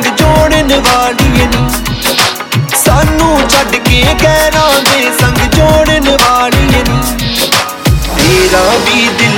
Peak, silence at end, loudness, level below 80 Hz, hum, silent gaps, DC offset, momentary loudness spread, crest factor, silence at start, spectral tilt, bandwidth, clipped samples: 0 dBFS; 0 s; -8 LUFS; -18 dBFS; none; none; under 0.1%; 4 LU; 8 dB; 0 s; -4 dB/octave; over 20 kHz; 0.6%